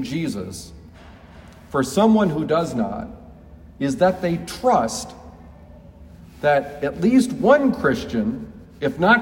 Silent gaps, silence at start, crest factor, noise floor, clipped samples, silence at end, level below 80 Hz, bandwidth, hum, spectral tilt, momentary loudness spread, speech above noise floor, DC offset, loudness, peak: none; 0 s; 20 dB; -44 dBFS; under 0.1%; 0 s; -48 dBFS; 16.5 kHz; none; -5.5 dB/octave; 17 LU; 24 dB; under 0.1%; -20 LUFS; -2 dBFS